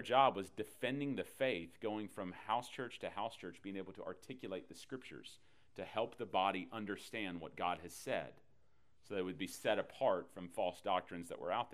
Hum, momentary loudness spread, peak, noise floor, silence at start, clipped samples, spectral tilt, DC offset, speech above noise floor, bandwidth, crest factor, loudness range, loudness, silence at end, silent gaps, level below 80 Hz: none; 13 LU; -16 dBFS; -76 dBFS; 0 s; under 0.1%; -4.5 dB/octave; under 0.1%; 36 dB; 15.5 kHz; 24 dB; 5 LU; -41 LUFS; 0 s; none; -76 dBFS